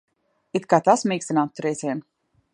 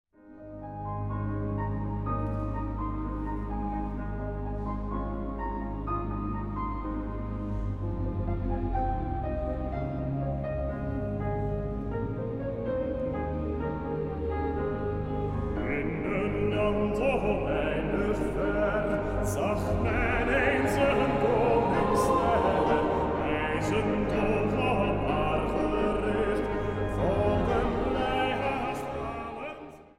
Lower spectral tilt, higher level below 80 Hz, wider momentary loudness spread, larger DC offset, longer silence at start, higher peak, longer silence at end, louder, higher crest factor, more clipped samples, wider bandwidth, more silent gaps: second, -5 dB/octave vs -7 dB/octave; second, -74 dBFS vs -38 dBFS; first, 12 LU vs 9 LU; neither; first, 0.55 s vs 0.25 s; first, -2 dBFS vs -10 dBFS; first, 0.55 s vs 0.15 s; first, -22 LUFS vs -29 LUFS; about the same, 22 dB vs 18 dB; neither; second, 11.5 kHz vs 15 kHz; neither